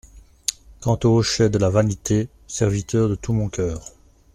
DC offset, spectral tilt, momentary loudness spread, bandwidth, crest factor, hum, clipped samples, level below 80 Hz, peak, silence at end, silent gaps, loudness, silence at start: under 0.1%; -5.5 dB/octave; 10 LU; 14 kHz; 20 dB; none; under 0.1%; -42 dBFS; -2 dBFS; 0.45 s; none; -21 LUFS; 0.15 s